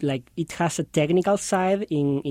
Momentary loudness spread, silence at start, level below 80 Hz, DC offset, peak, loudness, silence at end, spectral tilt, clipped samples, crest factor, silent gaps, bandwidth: 7 LU; 0 s; -58 dBFS; under 0.1%; -8 dBFS; -24 LUFS; 0 s; -5.5 dB/octave; under 0.1%; 14 dB; none; 16 kHz